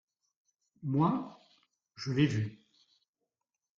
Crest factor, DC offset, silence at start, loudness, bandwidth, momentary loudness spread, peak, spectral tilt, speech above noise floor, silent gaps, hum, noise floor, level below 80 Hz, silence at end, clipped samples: 20 dB; under 0.1%; 0.8 s; -32 LUFS; 7.6 kHz; 13 LU; -16 dBFS; -7 dB/octave; 59 dB; none; none; -90 dBFS; -70 dBFS; 1.2 s; under 0.1%